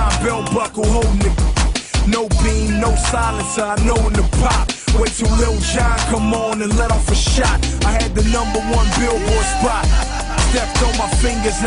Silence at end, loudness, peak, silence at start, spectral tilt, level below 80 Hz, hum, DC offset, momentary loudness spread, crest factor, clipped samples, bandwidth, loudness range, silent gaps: 0 s; -17 LUFS; -4 dBFS; 0 s; -4.5 dB/octave; -18 dBFS; none; under 0.1%; 2 LU; 12 dB; under 0.1%; 11 kHz; 1 LU; none